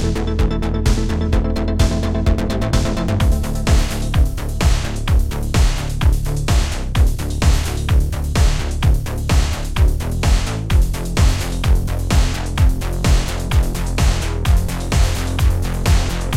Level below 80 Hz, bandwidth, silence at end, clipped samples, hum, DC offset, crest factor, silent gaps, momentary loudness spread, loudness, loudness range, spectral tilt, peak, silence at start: -18 dBFS; 16 kHz; 0 s; under 0.1%; none; 1%; 14 dB; none; 2 LU; -19 LUFS; 1 LU; -5.5 dB/octave; -2 dBFS; 0 s